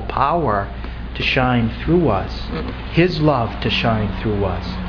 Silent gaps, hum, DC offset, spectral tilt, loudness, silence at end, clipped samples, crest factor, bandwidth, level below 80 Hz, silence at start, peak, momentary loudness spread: none; none; under 0.1%; -7.5 dB/octave; -19 LUFS; 0 s; under 0.1%; 16 dB; 5.4 kHz; -30 dBFS; 0 s; -2 dBFS; 10 LU